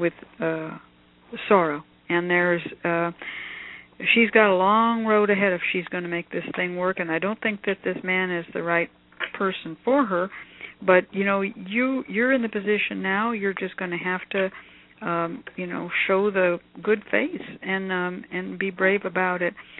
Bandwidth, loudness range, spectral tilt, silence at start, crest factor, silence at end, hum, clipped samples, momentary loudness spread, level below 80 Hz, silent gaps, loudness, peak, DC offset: 4.1 kHz; 5 LU; -9.5 dB/octave; 0 s; 22 dB; 0 s; none; under 0.1%; 12 LU; -66 dBFS; none; -24 LUFS; -2 dBFS; under 0.1%